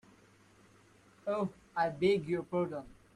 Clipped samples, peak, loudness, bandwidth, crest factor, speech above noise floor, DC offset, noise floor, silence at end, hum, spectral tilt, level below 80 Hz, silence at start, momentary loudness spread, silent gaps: under 0.1%; -18 dBFS; -34 LUFS; 11.5 kHz; 18 dB; 30 dB; under 0.1%; -63 dBFS; 0.2 s; none; -7 dB/octave; -68 dBFS; 1.25 s; 10 LU; none